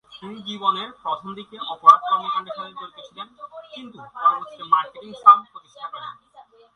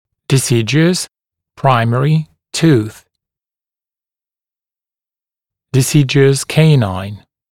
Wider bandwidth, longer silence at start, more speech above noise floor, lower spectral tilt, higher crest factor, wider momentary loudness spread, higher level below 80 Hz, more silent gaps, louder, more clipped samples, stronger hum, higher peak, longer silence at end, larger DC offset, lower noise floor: second, 6.4 kHz vs 16 kHz; second, 0.15 s vs 0.3 s; second, 29 dB vs over 78 dB; second, -4 dB/octave vs -5.5 dB/octave; first, 22 dB vs 16 dB; first, 24 LU vs 11 LU; second, -72 dBFS vs -52 dBFS; neither; second, -19 LUFS vs -13 LUFS; neither; neither; about the same, 0 dBFS vs 0 dBFS; first, 0.65 s vs 0.35 s; neither; second, -51 dBFS vs under -90 dBFS